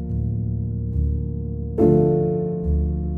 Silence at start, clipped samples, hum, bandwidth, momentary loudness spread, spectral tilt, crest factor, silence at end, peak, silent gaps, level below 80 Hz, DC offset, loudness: 0 s; under 0.1%; none; 2.2 kHz; 10 LU; -13 dB/octave; 16 dB; 0 s; -4 dBFS; none; -28 dBFS; under 0.1%; -22 LUFS